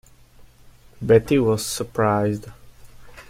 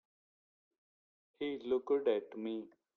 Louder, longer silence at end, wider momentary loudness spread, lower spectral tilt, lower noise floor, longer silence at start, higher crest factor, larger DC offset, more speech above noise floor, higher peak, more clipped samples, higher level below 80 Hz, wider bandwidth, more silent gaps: first, -20 LUFS vs -37 LUFS; second, 0.05 s vs 0.3 s; about the same, 12 LU vs 10 LU; about the same, -6 dB/octave vs -7 dB/octave; second, -49 dBFS vs under -90 dBFS; second, 1 s vs 1.4 s; about the same, 20 dB vs 18 dB; neither; second, 29 dB vs over 54 dB; first, -4 dBFS vs -20 dBFS; neither; first, -48 dBFS vs -80 dBFS; first, 16.5 kHz vs 4.4 kHz; neither